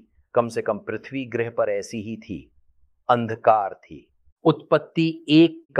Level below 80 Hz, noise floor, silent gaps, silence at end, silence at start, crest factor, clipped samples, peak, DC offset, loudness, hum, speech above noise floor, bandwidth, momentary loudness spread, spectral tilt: -62 dBFS; -59 dBFS; 4.32-4.36 s, 5.65-5.69 s; 0 s; 0.35 s; 20 dB; under 0.1%; -2 dBFS; under 0.1%; -23 LUFS; none; 37 dB; 10.5 kHz; 16 LU; -6.5 dB/octave